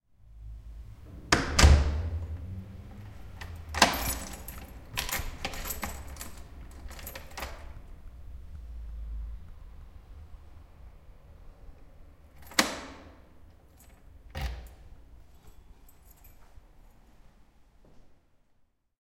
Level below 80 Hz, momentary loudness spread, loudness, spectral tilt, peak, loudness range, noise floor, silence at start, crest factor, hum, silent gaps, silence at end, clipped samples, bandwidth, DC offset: -36 dBFS; 27 LU; -30 LUFS; -3.5 dB/octave; -4 dBFS; 19 LU; -68 dBFS; 0.25 s; 30 dB; none; none; 0.95 s; under 0.1%; 17 kHz; under 0.1%